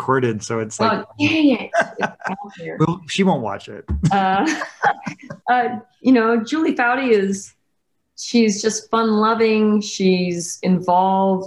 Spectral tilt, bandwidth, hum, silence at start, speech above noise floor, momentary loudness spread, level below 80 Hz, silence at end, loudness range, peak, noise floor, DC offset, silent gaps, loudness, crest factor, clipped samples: -5 dB/octave; 12 kHz; none; 0 s; 55 dB; 12 LU; -42 dBFS; 0 s; 3 LU; -4 dBFS; -73 dBFS; under 0.1%; none; -19 LUFS; 16 dB; under 0.1%